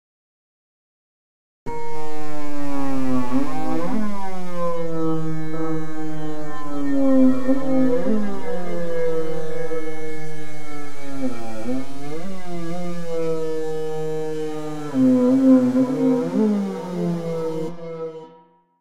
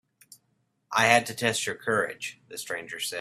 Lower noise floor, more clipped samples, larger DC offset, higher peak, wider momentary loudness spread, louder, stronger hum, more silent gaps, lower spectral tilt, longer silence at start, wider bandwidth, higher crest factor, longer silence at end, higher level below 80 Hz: second, -52 dBFS vs -73 dBFS; neither; first, 20% vs under 0.1%; second, -6 dBFS vs -2 dBFS; about the same, 16 LU vs 15 LU; about the same, -24 LUFS vs -26 LUFS; neither; neither; first, -7.5 dB/octave vs -2.5 dB/octave; first, 1.65 s vs 0.9 s; second, 12 kHz vs 16 kHz; second, 16 dB vs 26 dB; about the same, 0 s vs 0 s; first, -50 dBFS vs -70 dBFS